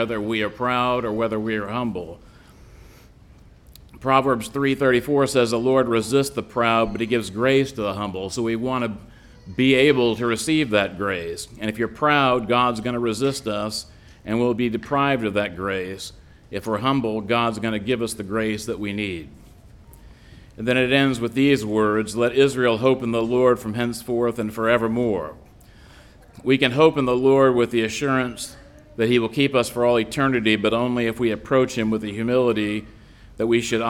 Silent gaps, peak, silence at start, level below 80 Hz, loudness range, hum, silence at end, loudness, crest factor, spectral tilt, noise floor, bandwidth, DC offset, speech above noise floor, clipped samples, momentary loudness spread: none; -2 dBFS; 0 s; -50 dBFS; 5 LU; none; 0 s; -21 LUFS; 18 dB; -5.5 dB/octave; -48 dBFS; 16.5 kHz; under 0.1%; 27 dB; under 0.1%; 10 LU